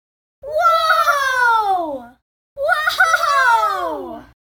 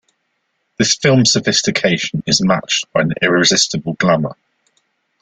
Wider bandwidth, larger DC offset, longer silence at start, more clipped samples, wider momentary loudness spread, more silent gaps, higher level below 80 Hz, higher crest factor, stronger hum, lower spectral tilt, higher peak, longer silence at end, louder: first, 18 kHz vs 10 kHz; neither; second, 0.45 s vs 0.8 s; neither; first, 13 LU vs 6 LU; first, 2.22-2.56 s vs none; about the same, -54 dBFS vs -50 dBFS; about the same, 16 dB vs 16 dB; neither; second, -1 dB/octave vs -3.5 dB/octave; about the same, -2 dBFS vs 0 dBFS; second, 0.3 s vs 0.9 s; about the same, -16 LUFS vs -14 LUFS